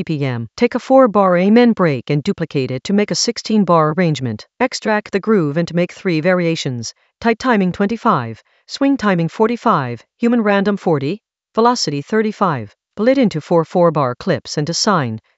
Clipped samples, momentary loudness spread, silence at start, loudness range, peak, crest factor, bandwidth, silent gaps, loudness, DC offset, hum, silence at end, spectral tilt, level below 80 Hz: under 0.1%; 8 LU; 0 s; 3 LU; 0 dBFS; 16 dB; 8.2 kHz; none; -16 LUFS; under 0.1%; none; 0.2 s; -5.5 dB/octave; -56 dBFS